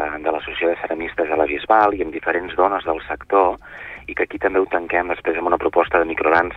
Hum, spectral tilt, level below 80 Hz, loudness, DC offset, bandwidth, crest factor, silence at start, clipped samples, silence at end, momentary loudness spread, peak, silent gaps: none; -7 dB/octave; -46 dBFS; -20 LUFS; under 0.1%; 5.8 kHz; 18 dB; 0 s; under 0.1%; 0 s; 8 LU; -2 dBFS; none